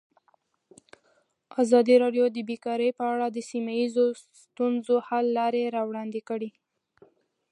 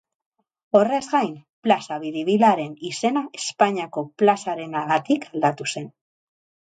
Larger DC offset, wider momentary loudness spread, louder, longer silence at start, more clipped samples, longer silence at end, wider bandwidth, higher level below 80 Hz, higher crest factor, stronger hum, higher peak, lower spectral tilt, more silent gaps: neither; about the same, 13 LU vs 11 LU; second, -26 LUFS vs -22 LUFS; first, 1.55 s vs 0.75 s; neither; first, 1.05 s vs 0.75 s; first, 10.5 kHz vs 9.4 kHz; second, -84 dBFS vs -72 dBFS; about the same, 20 dB vs 20 dB; neither; second, -8 dBFS vs -2 dBFS; about the same, -5 dB/octave vs -4.5 dB/octave; second, none vs 1.49-1.62 s